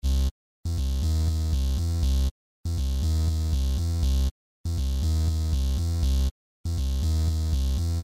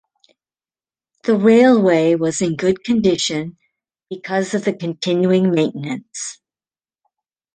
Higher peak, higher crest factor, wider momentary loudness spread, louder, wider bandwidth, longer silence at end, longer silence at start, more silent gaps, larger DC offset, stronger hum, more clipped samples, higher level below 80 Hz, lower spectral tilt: second, -14 dBFS vs -2 dBFS; about the same, 12 dB vs 16 dB; second, 6 LU vs 16 LU; second, -27 LUFS vs -17 LUFS; first, 15.5 kHz vs 9.8 kHz; second, 0 s vs 1.2 s; second, 0 s vs 1.25 s; first, 0.31-0.63 s, 2.31-2.64 s, 4.31-4.64 s, 6.31-6.64 s vs none; first, 0.4% vs under 0.1%; neither; neither; first, -26 dBFS vs -58 dBFS; about the same, -6 dB/octave vs -5.5 dB/octave